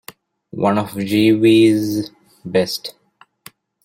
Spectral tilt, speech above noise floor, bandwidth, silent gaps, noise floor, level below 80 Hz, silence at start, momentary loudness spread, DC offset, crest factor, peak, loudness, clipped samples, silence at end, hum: -6 dB/octave; 31 dB; 16.5 kHz; none; -46 dBFS; -56 dBFS; 0.55 s; 21 LU; under 0.1%; 16 dB; -2 dBFS; -16 LUFS; under 0.1%; 0.95 s; none